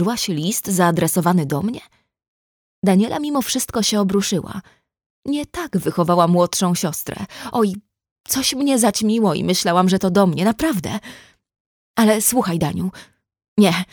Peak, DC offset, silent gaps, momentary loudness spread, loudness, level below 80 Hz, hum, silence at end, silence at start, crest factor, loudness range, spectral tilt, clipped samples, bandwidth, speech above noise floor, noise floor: -2 dBFS; under 0.1%; 2.28-2.82 s, 5.06-5.22 s, 8.11-8.24 s, 11.60-11.94 s, 13.48-13.56 s; 11 LU; -18 LUFS; -52 dBFS; none; 0.1 s; 0 s; 18 dB; 3 LU; -4.5 dB/octave; under 0.1%; over 20 kHz; over 72 dB; under -90 dBFS